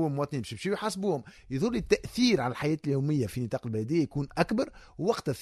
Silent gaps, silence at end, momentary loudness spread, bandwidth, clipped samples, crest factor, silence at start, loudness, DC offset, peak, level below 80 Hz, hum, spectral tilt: none; 0 s; 8 LU; 14 kHz; under 0.1%; 22 dB; 0 s; -30 LUFS; under 0.1%; -8 dBFS; -54 dBFS; none; -6 dB/octave